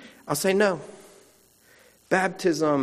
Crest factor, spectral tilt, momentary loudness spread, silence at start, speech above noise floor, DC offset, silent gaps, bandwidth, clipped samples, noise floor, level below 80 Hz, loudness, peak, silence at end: 20 dB; -4.5 dB/octave; 11 LU; 0 s; 35 dB; under 0.1%; none; 15.5 kHz; under 0.1%; -58 dBFS; -70 dBFS; -24 LUFS; -6 dBFS; 0 s